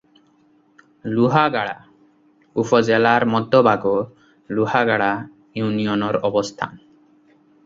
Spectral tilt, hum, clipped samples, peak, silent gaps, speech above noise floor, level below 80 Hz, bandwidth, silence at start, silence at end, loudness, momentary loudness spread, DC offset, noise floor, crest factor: -6 dB/octave; none; under 0.1%; -2 dBFS; none; 39 dB; -60 dBFS; 7.8 kHz; 1.05 s; 0.9 s; -19 LUFS; 14 LU; under 0.1%; -57 dBFS; 20 dB